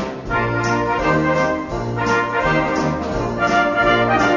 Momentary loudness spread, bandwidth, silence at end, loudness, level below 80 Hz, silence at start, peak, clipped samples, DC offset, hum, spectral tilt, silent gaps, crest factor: 7 LU; 7.4 kHz; 0 s; -18 LUFS; -36 dBFS; 0 s; -4 dBFS; under 0.1%; 0.1%; none; -5.5 dB/octave; none; 14 dB